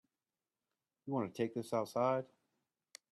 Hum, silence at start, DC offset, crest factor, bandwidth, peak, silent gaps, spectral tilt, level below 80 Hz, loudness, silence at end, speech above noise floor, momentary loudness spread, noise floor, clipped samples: none; 1.05 s; under 0.1%; 20 dB; 13.5 kHz; -22 dBFS; none; -6.5 dB/octave; -84 dBFS; -38 LUFS; 0.9 s; over 53 dB; 21 LU; under -90 dBFS; under 0.1%